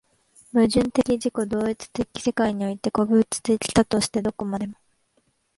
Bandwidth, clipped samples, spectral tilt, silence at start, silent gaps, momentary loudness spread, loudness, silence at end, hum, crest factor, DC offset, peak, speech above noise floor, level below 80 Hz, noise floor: 11.5 kHz; under 0.1%; -5 dB/octave; 0.55 s; none; 9 LU; -23 LUFS; 0.85 s; none; 18 dB; under 0.1%; -6 dBFS; 45 dB; -50 dBFS; -68 dBFS